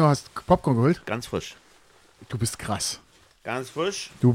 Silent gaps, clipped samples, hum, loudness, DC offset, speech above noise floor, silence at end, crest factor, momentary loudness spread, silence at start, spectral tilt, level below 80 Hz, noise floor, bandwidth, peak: none; under 0.1%; none; -26 LUFS; under 0.1%; 32 dB; 0 s; 20 dB; 14 LU; 0 s; -5.5 dB/octave; -50 dBFS; -56 dBFS; 16 kHz; -6 dBFS